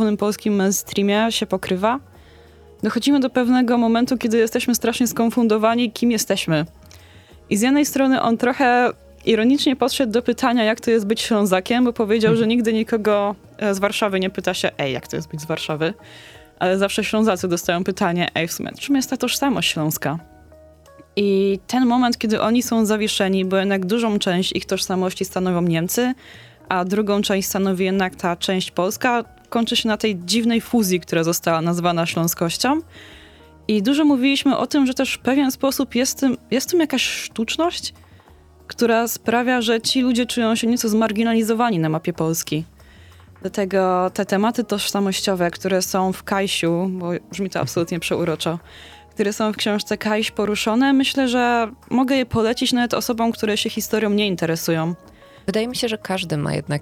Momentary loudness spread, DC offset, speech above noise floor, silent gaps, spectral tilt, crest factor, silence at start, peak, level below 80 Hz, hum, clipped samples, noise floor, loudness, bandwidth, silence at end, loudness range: 7 LU; under 0.1%; 29 dB; none; -4.5 dB/octave; 18 dB; 0 s; -2 dBFS; -52 dBFS; none; under 0.1%; -48 dBFS; -20 LUFS; 17.5 kHz; 0 s; 4 LU